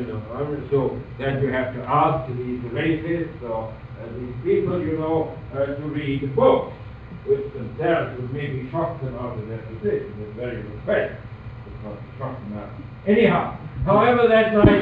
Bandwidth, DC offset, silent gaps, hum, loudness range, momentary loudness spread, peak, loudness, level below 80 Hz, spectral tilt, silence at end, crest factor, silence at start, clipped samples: 5 kHz; under 0.1%; none; none; 6 LU; 17 LU; -2 dBFS; -23 LUFS; -42 dBFS; -10 dB/octave; 0 s; 22 dB; 0 s; under 0.1%